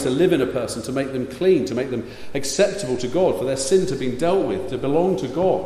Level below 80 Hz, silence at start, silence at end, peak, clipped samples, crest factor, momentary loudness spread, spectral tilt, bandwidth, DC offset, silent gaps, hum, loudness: -48 dBFS; 0 s; 0 s; -6 dBFS; under 0.1%; 16 dB; 7 LU; -5 dB/octave; 14.5 kHz; under 0.1%; none; none; -21 LUFS